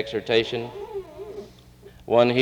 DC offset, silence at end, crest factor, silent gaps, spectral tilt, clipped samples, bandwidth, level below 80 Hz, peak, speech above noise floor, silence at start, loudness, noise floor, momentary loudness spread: under 0.1%; 0 s; 20 dB; none; -6 dB/octave; under 0.1%; 11 kHz; -54 dBFS; -4 dBFS; 27 dB; 0 s; -24 LUFS; -48 dBFS; 19 LU